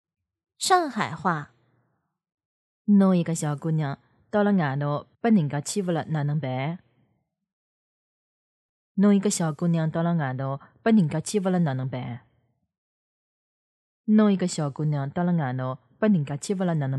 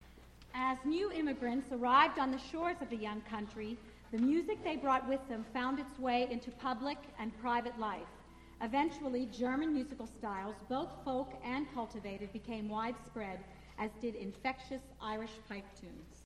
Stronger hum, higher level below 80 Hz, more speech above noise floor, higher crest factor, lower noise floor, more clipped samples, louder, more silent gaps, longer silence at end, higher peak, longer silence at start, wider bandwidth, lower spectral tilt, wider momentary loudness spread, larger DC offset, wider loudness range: neither; second, -70 dBFS vs -60 dBFS; first, 50 dB vs 20 dB; second, 18 dB vs 24 dB; first, -74 dBFS vs -58 dBFS; neither; first, -25 LUFS vs -38 LUFS; first, 2.34-2.38 s, 2.45-2.85 s, 7.53-8.95 s, 12.78-14.04 s vs none; about the same, 0 s vs 0 s; first, -6 dBFS vs -14 dBFS; first, 0.6 s vs 0 s; about the same, 12 kHz vs 12.5 kHz; about the same, -6.5 dB/octave vs -5.5 dB/octave; about the same, 12 LU vs 12 LU; neither; second, 4 LU vs 7 LU